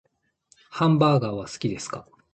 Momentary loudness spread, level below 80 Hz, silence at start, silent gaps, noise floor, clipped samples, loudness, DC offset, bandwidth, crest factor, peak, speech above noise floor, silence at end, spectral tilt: 17 LU; -58 dBFS; 0.7 s; none; -64 dBFS; under 0.1%; -23 LUFS; under 0.1%; 8.8 kHz; 18 dB; -6 dBFS; 41 dB; 0.3 s; -6.5 dB/octave